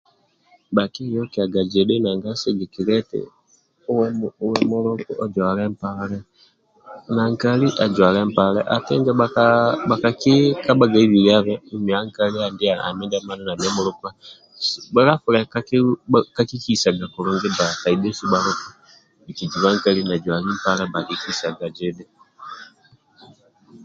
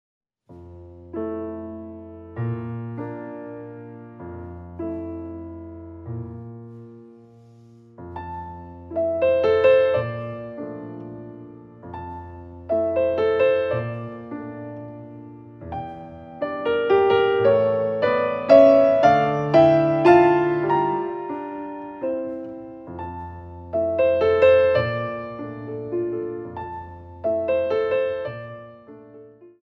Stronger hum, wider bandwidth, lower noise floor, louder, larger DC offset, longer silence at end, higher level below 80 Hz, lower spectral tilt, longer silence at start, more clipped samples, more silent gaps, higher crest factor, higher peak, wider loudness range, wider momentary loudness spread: neither; first, 7.8 kHz vs 6.2 kHz; first, -59 dBFS vs -49 dBFS; about the same, -20 LUFS vs -20 LUFS; neither; second, 0 s vs 0.15 s; about the same, -56 dBFS vs -54 dBFS; second, -5.5 dB/octave vs -8 dB/octave; first, 0.7 s vs 0.5 s; neither; neither; about the same, 20 dB vs 22 dB; about the same, 0 dBFS vs -2 dBFS; second, 7 LU vs 18 LU; second, 12 LU vs 23 LU